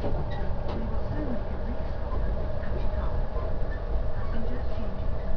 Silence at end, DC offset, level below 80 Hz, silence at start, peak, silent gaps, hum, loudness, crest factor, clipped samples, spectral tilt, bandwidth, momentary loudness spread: 0 s; under 0.1%; -30 dBFS; 0 s; -14 dBFS; none; none; -33 LUFS; 12 dB; under 0.1%; -9.5 dB/octave; 5.4 kHz; 2 LU